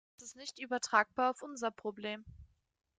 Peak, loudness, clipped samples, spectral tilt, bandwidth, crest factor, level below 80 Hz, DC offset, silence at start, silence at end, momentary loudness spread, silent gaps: -12 dBFS; -36 LUFS; under 0.1%; -2.5 dB/octave; 9.6 kHz; 26 dB; -68 dBFS; under 0.1%; 0.2 s; 0.55 s; 16 LU; none